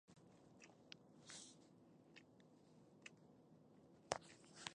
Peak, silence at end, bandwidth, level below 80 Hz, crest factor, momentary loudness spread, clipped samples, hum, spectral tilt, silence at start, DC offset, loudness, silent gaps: -20 dBFS; 0 s; 11 kHz; -86 dBFS; 40 dB; 19 LU; under 0.1%; none; -2.5 dB/octave; 0.05 s; under 0.1%; -57 LUFS; none